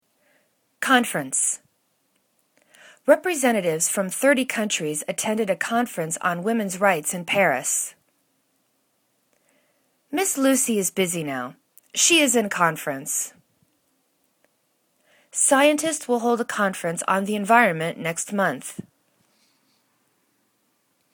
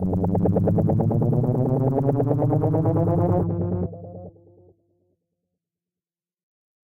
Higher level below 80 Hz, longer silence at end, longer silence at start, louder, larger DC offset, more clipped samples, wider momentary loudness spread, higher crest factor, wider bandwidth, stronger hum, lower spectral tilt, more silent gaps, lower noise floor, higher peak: second, -74 dBFS vs -46 dBFS; second, 2.3 s vs 2.55 s; first, 0.8 s vs 0 s; about the same, -22 LUFS vs -22 LUFS; neither; neither; first, 12 LU vs 8 LU; first, 24 dB vs 14 dB; first, 19 kHz vs 2.5 kHz; neither; second, -2.5 dB/octave vs -13 dB/octave; neither; second, -69 dBFS vs under -90 dBFS; first, -2 dBFS vs -10 dBFS